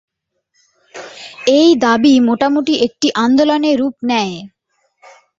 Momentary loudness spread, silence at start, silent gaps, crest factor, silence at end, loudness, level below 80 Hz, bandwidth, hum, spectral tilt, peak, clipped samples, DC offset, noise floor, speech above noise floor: 20 LU; 0.95 s; none; 14 dB; 0.9 s; -13 LUFS; -56 dBFS; 7.8 kHz; none; -4 dB/octave; -2 dBFS; under 0.1%; under 0.1%; -67 dBFS; 54 dB